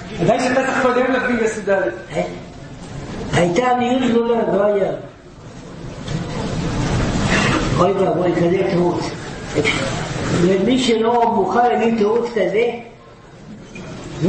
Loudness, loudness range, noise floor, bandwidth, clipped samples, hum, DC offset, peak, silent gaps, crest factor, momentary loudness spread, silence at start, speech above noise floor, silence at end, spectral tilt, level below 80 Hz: -18 LUFS; 3 LU; -41 dBFS; 8.8 kHz; under 0.1%; none; under 0.1%; -2 dBFS; none; 16 dB; 17 LU; 0 s; 24 dB; 0 s; -5.5 dB/octave; -36 dBFS